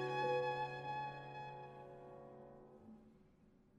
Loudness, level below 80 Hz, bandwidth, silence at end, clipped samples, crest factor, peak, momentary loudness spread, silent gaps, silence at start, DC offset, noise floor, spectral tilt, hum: -44 LUFS; -76 dBFS; 11 kHz; 0.15 s; under 0.1%; 18 dB; -28 dBFS; 22 LU; none; 0 s; under 0.1%; -69 dBFS; -6 dB/octave; none